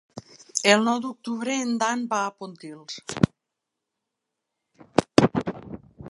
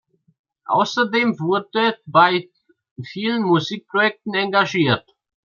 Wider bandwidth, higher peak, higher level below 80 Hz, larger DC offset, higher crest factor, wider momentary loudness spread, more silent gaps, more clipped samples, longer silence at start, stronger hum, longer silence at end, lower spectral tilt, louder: first, 11.5 kHz vs 7.4 kHz; about the same, 0 dBFS vs -2 dBFS; first, -54 dBFS vs -68 dBFS; neither; first, 26 dB vs 18 dB; first, 21 LU vs 9 LU; second, none vs 2.91-2.96 s; neither; second, 0.15 s vs 0.7 s; neither; second, 0 s vs 0.6 s; about the same, -4.5 dB/octave vs -5.5 dB/octave; second, -24 LUFS vs -19 LUFS